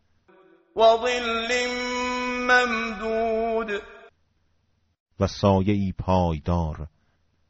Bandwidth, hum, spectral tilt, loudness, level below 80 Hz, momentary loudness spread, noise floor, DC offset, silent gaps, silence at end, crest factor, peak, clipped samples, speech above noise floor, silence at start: 8 kHz; none; -4 dB/octave; -23 LUFS; -44 dBFS; 11 LU; -68 dBFS; under 0.1%; 5.00-5.06 s; 0.6 s; 18 dB; -6 dBFS; under 0.1%; 45 dB; 0.75 s